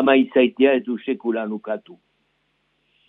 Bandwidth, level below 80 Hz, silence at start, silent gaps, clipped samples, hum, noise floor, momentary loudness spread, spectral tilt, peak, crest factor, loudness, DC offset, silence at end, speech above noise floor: 4 kHz; -74 dBFS; 0 s; none; under 0.1%; none; -69 dBFS; 13 LU; -8 dB/octave; -4 dBFS; 18 dB; -20 LUFS; under 0.1%; 1.15 s; 49 dB